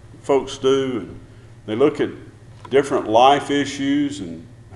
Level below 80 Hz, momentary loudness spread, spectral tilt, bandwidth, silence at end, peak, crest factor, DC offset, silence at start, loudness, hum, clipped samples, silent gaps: -50 dBFS; 20 LU; -5 dB/octave; 11.5 kHz; 0 s; -2 dBFS; 20 dB; under 0.1%; 0.05 s; -19 LUFS; none; under 0.1%; none